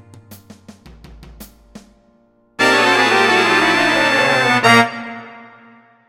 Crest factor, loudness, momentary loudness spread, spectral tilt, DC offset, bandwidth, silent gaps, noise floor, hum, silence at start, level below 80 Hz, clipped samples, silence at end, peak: 18 dB; -12 LUFS; 11 LU; -3 dB/octave; under 0.1%; 17 kHz; none; -55 dBFS; none; 0.3 s; -50 dBFS; under 0.1%; 0.65 s; 0 dBFS